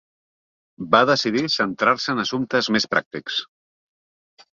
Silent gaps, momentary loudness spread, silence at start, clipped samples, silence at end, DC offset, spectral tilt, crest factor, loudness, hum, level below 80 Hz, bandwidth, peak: 3.06-3.11 s; 10 LU; 0.8 s; under 0.1%; 1.15 s; under 0.1%; -4 dB/octave; 22 dB; -20 LUFS; none; -64 dBFS; 7.6 kHz; -2 dBFS